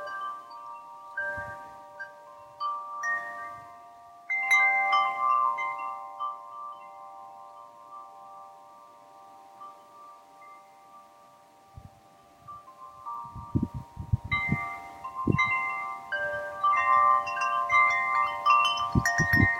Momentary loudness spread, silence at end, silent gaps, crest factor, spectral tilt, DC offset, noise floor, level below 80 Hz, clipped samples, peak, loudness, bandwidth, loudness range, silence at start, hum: 25 LU; 0 s; none; 22 dB; -4.5 dB/octave; under 0.1%; -56 dBFS; -52 dBFS; under 0.1%; -8 dBFS; -26 LUFS; 16.5 kHz; 23 LU; 0 s; none